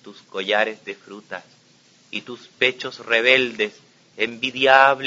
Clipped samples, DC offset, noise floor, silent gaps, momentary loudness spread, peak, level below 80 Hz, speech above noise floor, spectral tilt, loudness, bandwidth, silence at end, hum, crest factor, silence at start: under 0.1%; under 0.1%; -55 dBFS; none; 20 LU; 0 dBFS; -70 dBFS; 34 dB; -3 dB/octave; -19 LUFS; 7.8 kHz; 0 s; none; 22 dB; 0.05 s